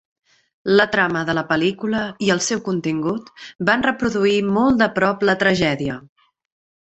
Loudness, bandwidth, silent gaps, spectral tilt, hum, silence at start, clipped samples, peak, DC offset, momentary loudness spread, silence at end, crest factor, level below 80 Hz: -19 LUFS; 8.2 kHz; 3.55-3.59 s; -4.5 dB/octave; none; 0.65 s; under 0.1%; -2 dBFS; under 0.1%; 9 LU; 0.8 s; 18 dB; -52 dBFS